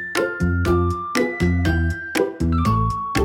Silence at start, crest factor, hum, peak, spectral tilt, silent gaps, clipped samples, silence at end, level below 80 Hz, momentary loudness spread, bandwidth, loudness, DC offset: 0 s; 16 dB; none; -4 dBFS; -6.5 dB/octave; none; under 0.1%; 0 s; -32 dBFS; 3 LU; 17 kHz; -21 LUFS; under 0.1%